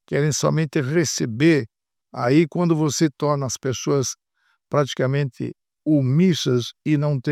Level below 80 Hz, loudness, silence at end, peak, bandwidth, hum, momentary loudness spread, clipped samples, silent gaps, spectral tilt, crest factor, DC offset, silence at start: -62 dBFS; -21 LUFS; 0 s; -6 dBFS; 14 kHz; none; 9 LU; under 0.1%; none; -5.5 dB/octave; 16 dB; under 0.1%; 0.1 s